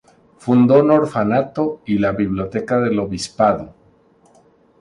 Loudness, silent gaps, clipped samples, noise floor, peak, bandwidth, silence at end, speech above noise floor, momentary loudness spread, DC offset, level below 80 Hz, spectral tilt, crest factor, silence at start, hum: -17 LUFS; none; under 0.1%; -53 dBFS; 0 dBFS; 11 kHz; 1.1 s; 37 dB; 12 LU; under 0.1%; -48 dBFS; -7 dB/octave; 18 dB; 0.45 s; none